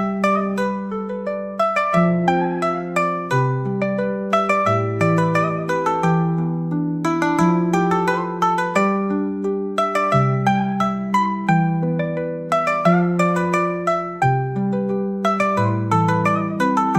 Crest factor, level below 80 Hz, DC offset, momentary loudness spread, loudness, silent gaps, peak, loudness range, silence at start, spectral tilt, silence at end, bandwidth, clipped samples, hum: 16 dB; -58 dBFS; 0.1%; 5 LU; -19 LUFS; none; -2 dBFS; 1 LU; 0 s; -7 dB/octave; 0 s; 13 kHz; under 0.1%; none